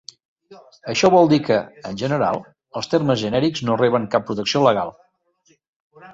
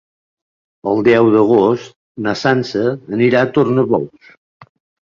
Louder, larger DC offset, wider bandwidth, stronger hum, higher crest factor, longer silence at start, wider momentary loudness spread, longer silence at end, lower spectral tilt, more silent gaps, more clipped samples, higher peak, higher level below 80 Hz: second, -19 LUFS vs -14 LUFS; neither; about the same, 7.8 kHz vs 7.4 kHz; neither; about the same, 18 dB vs 14 dB; second, 0.5 s vs 0.85 s; first, 15 LU vs 12 LU; second, 0 s vs 1 s; second, -5.5 dB/octave vs -7 dB/octave; about the same, 5.68-5.90 s vs 1.96-2.15 s; neither; about the same, -2 dBFS vs -2 dBFS; about the same, -56 dBFS vs -56 dBFS